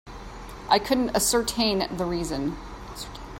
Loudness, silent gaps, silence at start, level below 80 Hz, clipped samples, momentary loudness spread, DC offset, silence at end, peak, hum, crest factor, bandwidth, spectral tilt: -24 LUFS; none; 0.05 s; -42 dBFS; under 0.1%; 18 LU; under 0.1%; 0 s; -6 dBFS; none; 20 dB; 16.5 kHz; -3.5 dB/octave